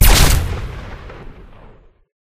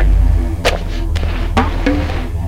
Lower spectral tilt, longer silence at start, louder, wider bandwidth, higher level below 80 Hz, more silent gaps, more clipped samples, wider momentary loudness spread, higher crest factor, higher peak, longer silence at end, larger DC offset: second, -3.5 dB/octave vs -6 dB/octave; about the same, 0 s vs 0 s; about the same, -15 LUFS vs -17 LUFS; first, 16.5 kHz vs 12 kHz; about the same, -18 dBFS vs -16 dBFS; neither; neither; first, 26 LU vs 6 LU; about the same, 16 dB vs 12 dB; about the same, 0 dBFS vs -2 dBFS; first, 0.9 s vs 0 s; neither